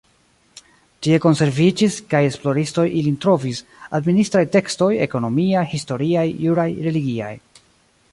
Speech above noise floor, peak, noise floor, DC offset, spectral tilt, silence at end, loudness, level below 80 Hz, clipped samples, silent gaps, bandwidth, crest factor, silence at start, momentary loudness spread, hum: 40 dB; -2 dBFS; -58 dBFS; under 0.1%; -6.5 dB/octave; 0.75 s; -19 LUFS; -56 dBFS; under 0.1%; none; 11.5 kHz; 16 dB; 1 s; 9 LU; none